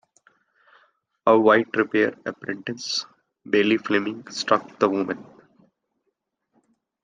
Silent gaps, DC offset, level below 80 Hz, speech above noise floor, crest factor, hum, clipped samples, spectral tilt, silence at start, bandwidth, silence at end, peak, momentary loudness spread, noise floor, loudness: none; under 0.1%; -74 dBFS; 55 dB; 22 dB; none; under 0.1%; -4.5 dB/octave; 1.25 s; 9.4 kHz; 1.8 s; -4 dBFS; 13 LU; -77 dBFS; -22 LUFS